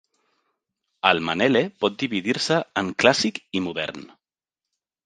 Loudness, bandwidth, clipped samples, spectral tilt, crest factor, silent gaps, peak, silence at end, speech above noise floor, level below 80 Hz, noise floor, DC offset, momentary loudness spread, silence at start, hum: -22 LUFS; 9.8 kHz; under 0.1%; -4 dB/octave; 24 dB; none; 0 dBFS; 1 s; 67 dB; -60 dBFS; -89 dBFS; under 0.1%; 9 LU; 1.05 s; none